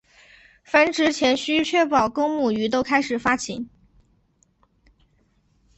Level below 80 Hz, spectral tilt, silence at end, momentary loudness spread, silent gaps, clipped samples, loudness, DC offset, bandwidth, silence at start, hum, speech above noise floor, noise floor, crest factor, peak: -58 dBFS; -3.5 dB/octave; 2.1 s; 6 LU; none; under 0.1%; -21 LUFS; under 0.1%; 8.4 kHz; 0.7 s; none; 43 dB; -64 dBFS; 20 dB; -2 dBFS